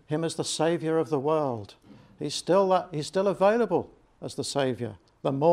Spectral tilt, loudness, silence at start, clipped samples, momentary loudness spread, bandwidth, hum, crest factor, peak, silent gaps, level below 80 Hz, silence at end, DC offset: -5 dB/octave; -27 LUFS; 0.1 s; under 0.1%; 15 LU; 15 kHz; none; 18 dB; -8 dBFS; none; -66 dBFS; 0 s; under 0.1%